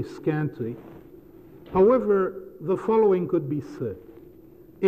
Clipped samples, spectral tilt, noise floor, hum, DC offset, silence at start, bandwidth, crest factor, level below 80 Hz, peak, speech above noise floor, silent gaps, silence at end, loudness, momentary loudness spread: under 0.1%; -9.5 dB/octave; -49 dBFS; none; under 0.1%; 0 s; 14.5 kHz; 14 dB; -56 dBFS; -10 dBFS; 26 dB; none; 0 s; -24 LUFS; 15 LU